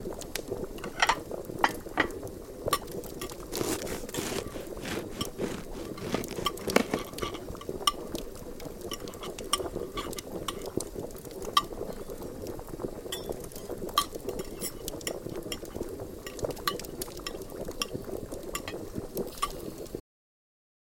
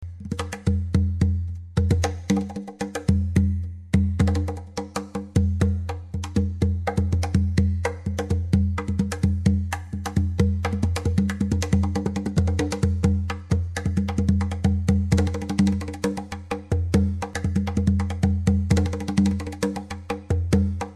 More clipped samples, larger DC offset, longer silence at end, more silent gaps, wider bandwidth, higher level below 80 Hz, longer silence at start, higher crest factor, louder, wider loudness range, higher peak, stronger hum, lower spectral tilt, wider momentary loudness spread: neither; neither; first, 1 s vs 0 s; neither; first, 17 kHz vs 12 kHz; second, -48 dBFS vs -32 dBFS; about the same, 0 s vs 0 s; first, 30 dB vs 16 dB; second, -34 LUFS vs -24 LUFS; first, 5 LU vs 1 LU; about the same, -6 dBFS vs -6 dBFS; neither; second, -3 dB/octave vs -7 dB/octave; first, 11 LU vs 8 LU